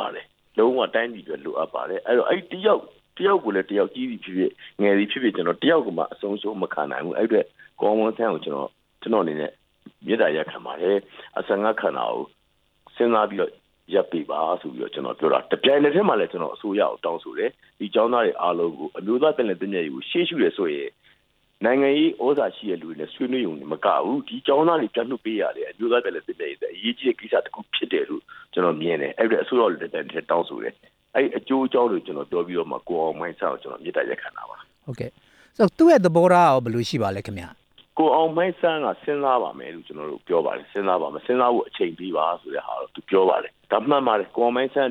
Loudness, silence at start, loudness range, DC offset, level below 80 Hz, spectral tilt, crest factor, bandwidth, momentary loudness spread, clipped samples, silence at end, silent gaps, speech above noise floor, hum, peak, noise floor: -23 LUFS; 0 s; 5 LU; under 0.1%; -68 dBFS; -6.5 dB/octave; 20 dB; 10.5 kHz; 12 LU; under 0.1%; 0 s; none; 43 dB; none; -4 dBFS; -66 dBFS